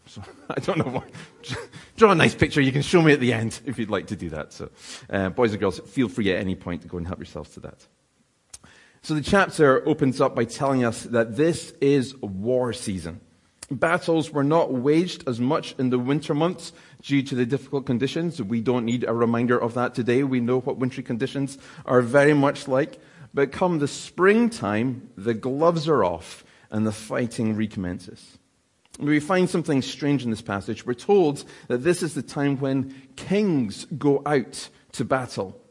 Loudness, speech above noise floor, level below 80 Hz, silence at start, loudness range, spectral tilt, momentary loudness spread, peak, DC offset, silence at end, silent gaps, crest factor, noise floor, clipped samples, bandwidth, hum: -23 LUFS; 43 dB; -56 dBFS; 0.15 s; 6 LU; -6 dB/octave; 16 LU; 0 dBFS; under 0.1%; 0.15 s; none; 24 dB; -66 dBFS; under 0.1%; 11.5 kHz; none